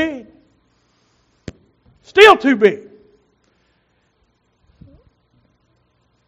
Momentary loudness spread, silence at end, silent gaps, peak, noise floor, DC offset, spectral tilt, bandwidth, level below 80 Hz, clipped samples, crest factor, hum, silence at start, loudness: 30 LU; 3.5 s; none; 0 dBFS; -63 dBFS; under 0.1%; -1 dB/octave; 7.6 kHz; -54 dBFS; 0.3%; 20 dB; 60 Hz at -60 dBFS; 0 s; -11 LUFS